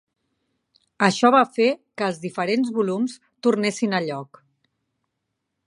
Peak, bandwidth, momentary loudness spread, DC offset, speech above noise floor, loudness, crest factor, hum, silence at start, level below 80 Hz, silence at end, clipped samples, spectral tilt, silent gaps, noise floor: -2 dBFS; 11.5 kHz; 10 LU; under 0.1%; 58 dB; -22 LUFS; 22 dB; none; 1 s; -74 dBFS; 1.4 s; under 0.1%; -5 dB/octave; none; -79 dBFS